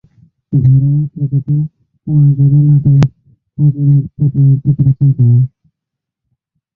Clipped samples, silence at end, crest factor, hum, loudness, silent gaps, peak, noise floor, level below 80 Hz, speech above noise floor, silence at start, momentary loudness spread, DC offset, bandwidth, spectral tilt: under 0.1%; 1.3 s; 12 dB; none; -12 LUFS; none; 0 dBFS; -79 dBFS; -40 dBFS; 70 dB; 0.5 s; 8 LU; under 0.1%; 2 kHz; -11 dB/octave